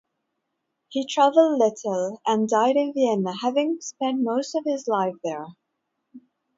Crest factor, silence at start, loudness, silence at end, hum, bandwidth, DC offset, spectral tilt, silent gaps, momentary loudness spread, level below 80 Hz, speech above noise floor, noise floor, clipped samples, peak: 18 dB; 0.9 s; -23 LUFS; 0.4 s; none; 7.8 kHz; under 0.1%; -5 dB/octave; none; 12 LU; -78 dBFS; 56 dB; -79 dBFS; under 0.1%; -6 dBFS